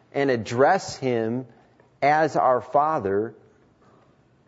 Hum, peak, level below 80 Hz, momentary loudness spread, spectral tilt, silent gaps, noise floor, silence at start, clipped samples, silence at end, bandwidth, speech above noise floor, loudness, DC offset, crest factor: none; -6 dBFS; -66 dBFS; 8 LU; -5.5 dB/octave; none; -59 dBFS; 0.15 s; under 0.1%; 1.15 s; 8 kHz; 37 dB; -23 LUFS; under 0.1%; 18 dB